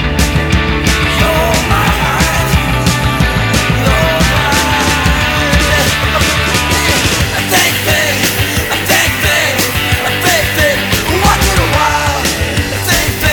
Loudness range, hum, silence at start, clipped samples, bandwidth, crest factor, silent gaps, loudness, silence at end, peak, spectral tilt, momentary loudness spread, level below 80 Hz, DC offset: 1 LU; none; 0 s; under 0.1%; over 20 kHz; 12 dB; none; -11 LUFS; 0 s; 0 dBFS; -3.5 dB/octave; 3 LU; -20 dBFS; under 0.1%